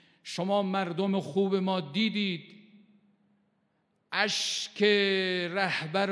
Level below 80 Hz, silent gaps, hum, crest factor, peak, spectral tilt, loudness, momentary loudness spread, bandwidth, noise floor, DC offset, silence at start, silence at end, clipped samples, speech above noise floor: -88 dBFS; none; none; 20 dB; -10 dBFS; -4 dB/octave; -28 LUFS; 8 LU; 11 kHz; -74 dBFS; under 0.1%; 0.25 s; 0 s; under 0.1%; 45 dB